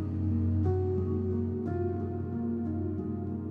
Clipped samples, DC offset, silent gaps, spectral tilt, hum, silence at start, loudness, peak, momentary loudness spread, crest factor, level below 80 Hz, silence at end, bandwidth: under 0.1%; under 0.1%; none; -12.5 dB/octave; none; 0 s; -32 LUFS; -18 dBFS; 6 LU; 12 dB; -52 dBFS; 0 s; 2.6 kHz